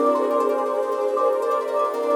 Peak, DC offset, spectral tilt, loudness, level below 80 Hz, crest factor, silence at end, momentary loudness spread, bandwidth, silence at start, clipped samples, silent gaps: -8 dBFS; under 0.1%; -3.5 dB/octave; -22 LUFS; -78 dBFS; 12 dB; 0 s; 3 LU; 18 kHz; 0 s; under 0.1%; none